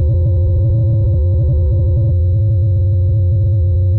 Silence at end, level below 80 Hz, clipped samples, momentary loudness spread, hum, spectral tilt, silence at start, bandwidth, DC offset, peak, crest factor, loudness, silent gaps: 0 s; -20 dBFS; under 0.1%; 0 LU; none; -13.5 dB/octave; 0 s; 1 kHz; under 0.1%; -8 dBFS; 4 dB; -14 LUFS; none